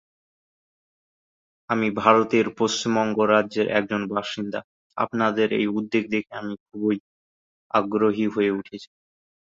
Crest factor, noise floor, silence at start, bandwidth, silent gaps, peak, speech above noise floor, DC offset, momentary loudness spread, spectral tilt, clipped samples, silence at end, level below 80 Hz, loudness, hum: 22 dB; under -90 dBFS; 1.7 s; 7.8 kHz; 4.64-4.90 s, 6.60-6.66 s, 7.00-7.70 s; -2 dBFS; over 67 dB; under 0.1%; 13 LU; -5 dB/octave; under 0.1%; 0.6 s; -64 dBFS; -23 LUFS; none